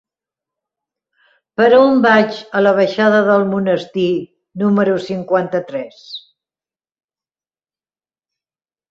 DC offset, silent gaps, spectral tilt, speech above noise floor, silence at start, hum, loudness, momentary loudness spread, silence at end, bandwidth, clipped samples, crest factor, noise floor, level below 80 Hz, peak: under 0.1%; none; -7 dB/octave; over 76 dB; 1.6 s; none; -14 LUFS; 18 LU; 2.7 s; 7.4 kHz; under 0.1%; 16 dB; under -90 dBFS; -62 dBFS; -2 dBFS